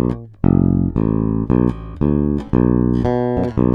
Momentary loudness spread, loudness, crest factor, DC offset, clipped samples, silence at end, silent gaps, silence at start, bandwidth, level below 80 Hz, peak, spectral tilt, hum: 5 LU; -17 LUFS; 16 dB; under 0.1%; under 0.1%; 0 s; none; 0 s; 5.4 kHz; -28 dBFS; 0 dBFS; -11.5 dB/octave; none